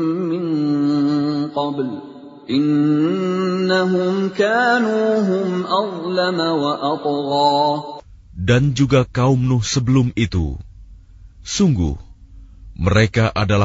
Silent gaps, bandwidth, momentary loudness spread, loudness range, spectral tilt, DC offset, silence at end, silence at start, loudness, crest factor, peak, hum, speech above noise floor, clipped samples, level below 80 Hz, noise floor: none; 7.8 kHz; 10 LU; 3 LU; -6 dB/octave; under 0.1%; 0 s; 0 s; -18 LUFS; 16 dB; -2 dBFS; none; 25 dB; under 0.1%; -38 dBFS; -42 dBFS